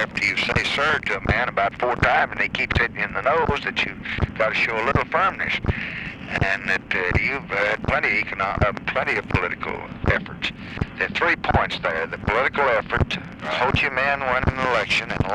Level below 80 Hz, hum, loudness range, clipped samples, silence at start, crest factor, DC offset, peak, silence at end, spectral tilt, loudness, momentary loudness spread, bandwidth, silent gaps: -36 dBFS; none; 2 LU; under 0.1%; 0 s; 20 dB; under 0.1%; -2 dBFS; 0 s; -5.5 dB/octave; -22 LUFS; 7 LU; 11.5 kHz; none